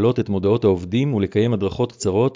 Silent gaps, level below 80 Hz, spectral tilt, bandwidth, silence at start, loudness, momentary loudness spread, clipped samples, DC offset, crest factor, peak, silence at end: none; -42 dBFS; -7 dB/octave; 7.6 kHz; 0 s; -20 LUFS; 4 LU; under 0.1%; under 0.1%; 14 dB; -6 dBFS; 0 s